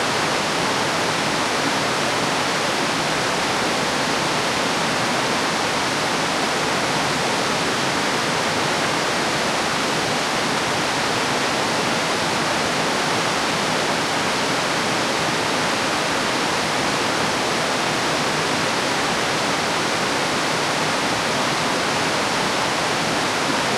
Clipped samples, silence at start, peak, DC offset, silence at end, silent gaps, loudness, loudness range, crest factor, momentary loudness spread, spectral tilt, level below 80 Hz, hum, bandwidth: under 0.1%; 0 s; -6 dBFS; under 0.1%; 0 s; none; -20 LUFS; 0 LU; 14 dB; 0 LU; -2.5 dB/octave; -52 dBFS; none; 16.5 kHz